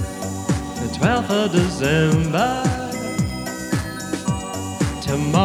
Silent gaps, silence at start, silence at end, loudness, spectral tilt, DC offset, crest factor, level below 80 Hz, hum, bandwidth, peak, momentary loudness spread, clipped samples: none; 0 s; 0 s; -21 LUFS; -5.5 dB/octave; under 0.1%; 18 dB; -38 dBFS; none; 16 kHz; -2 dBFS; 8 LU; under 0.1%